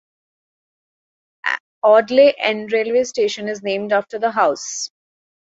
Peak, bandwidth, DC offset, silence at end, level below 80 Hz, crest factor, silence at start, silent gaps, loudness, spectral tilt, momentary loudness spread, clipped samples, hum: -2 dBFS; 8 kHz; under 0.1%; 0.55 s; -68 dBFS; 18 dB; 1.45 s; 1.60-1.82 s; -18 LUFS; -2.5 dB/octave; 12 LU; under 0.1%; none